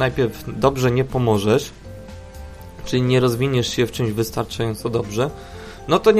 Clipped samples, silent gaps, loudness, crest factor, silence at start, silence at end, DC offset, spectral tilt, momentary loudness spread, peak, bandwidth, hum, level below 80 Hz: under 0.1%; none; -20 LUFS; 20 dB; 0 s; 0 s; under 0.1%; -6 dB/octave; 20 LU; 0 dBFS; 15.5 kHz; none; -40 dBFS